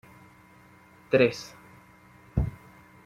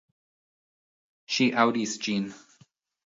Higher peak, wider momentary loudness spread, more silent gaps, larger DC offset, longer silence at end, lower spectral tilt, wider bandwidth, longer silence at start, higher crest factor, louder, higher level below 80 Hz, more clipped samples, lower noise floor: about the same, -6 dBFS vs -6 dBFS; first, 21 LU vs 9 LU; neither; neither; second, 0.55 s vs 0.7 s; first, -6.5 dB/octave vs -4 dB/octave; first, 15 kHz vs 7.8 kHz; second, 1.1 s vs 1.3 s; about the same, 24 dB vs 24 dB; about the same, -27 LUFS vs -26 LUFS; first, -44 dBFS vs -76 dBFS; neither; second, -55 dBFS vs -62 dBFS